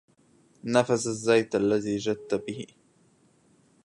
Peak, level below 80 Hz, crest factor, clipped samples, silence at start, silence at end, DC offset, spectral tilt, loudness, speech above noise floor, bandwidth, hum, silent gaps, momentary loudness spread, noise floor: -8 dBFS; -66 dBFS; 20 dB; under 0.1%; 0.65 s; 1.2 s; under 0.1%; -5 dB/octave; -26 LUFS; 37 dB; 11.5 kHz; none; none; 16 LU; -63 dBFS